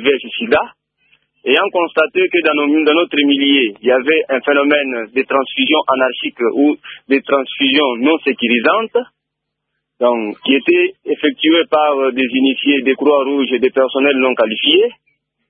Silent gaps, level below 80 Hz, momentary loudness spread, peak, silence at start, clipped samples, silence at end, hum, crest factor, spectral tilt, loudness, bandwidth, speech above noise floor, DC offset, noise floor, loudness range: none; -62 dBFS; 5 LU; 0 dBFS; 0 s; under 0.1%; 0.6 s; none; 14 dB; -7 dB/octave; -14 LUFS; 4.7 kHz; 63 dB; under 0.1%; -76 dBFS; 2 LU